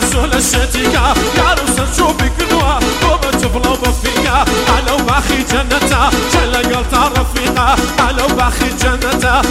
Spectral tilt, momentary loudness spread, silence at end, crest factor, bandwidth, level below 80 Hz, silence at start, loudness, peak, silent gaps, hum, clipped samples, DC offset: -3.5 dB/octave; 2 LU; 0 s; 12 dB; 16.5 kHz; -18 dBFS; 0 s; -12 LUFS; 0 dBFS; none; none; under 0.1%; under 0.1%